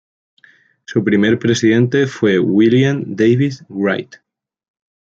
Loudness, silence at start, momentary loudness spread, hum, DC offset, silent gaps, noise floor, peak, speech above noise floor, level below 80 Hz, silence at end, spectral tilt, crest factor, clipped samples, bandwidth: -15 LUFS; 0.9 s; 8 LU; none; under 0.1%; none; -51 dBFS; -2 dBFS; 37 dB; -58 dBFS; 0.9 s; -6.5 dB/octave; 14 dB; under 0.1%; 7.8 kHz